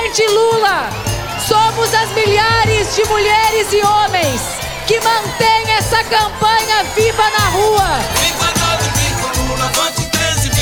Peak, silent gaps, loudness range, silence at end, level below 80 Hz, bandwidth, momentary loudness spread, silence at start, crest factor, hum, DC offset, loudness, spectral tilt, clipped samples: 0 dBFS; none; 1 LU; 0 s; -30 dBFS; over 20 kHz; 5 LU; 0 s; 14 dB; none; 0.4%; -13 LUFS; -3 dB/octave; under 0.1%